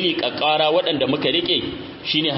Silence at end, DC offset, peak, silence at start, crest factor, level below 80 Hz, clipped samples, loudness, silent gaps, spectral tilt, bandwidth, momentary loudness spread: 0 s; under 0.1%; -4 dBFS; 0 s; 16 dB; -54 dBFS; under 0.1%; -19 LUFS; none; -8.5 dB/octave; 5.8 kHz; 5 LU